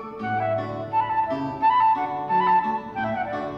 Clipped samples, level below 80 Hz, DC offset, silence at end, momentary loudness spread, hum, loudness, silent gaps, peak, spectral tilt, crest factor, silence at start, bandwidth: under 0.1%; -58 dBFS; under 0.1%; 0 s; 8 LU; none; -23 LUFS; none; -12 dBFS; -7.5 dB/octave; 12 dB; 0 s; 6 kHz